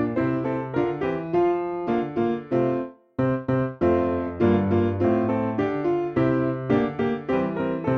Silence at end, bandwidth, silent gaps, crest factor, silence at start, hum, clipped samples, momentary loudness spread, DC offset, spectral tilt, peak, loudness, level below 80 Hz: 0 s; 6.2 kHz; none; 16 dB; 0 s; none; under 0.1%; 5 LU; under 0.1%; -10 dB/octave; -8 dBFS; -24 LUFS; -50 dBFS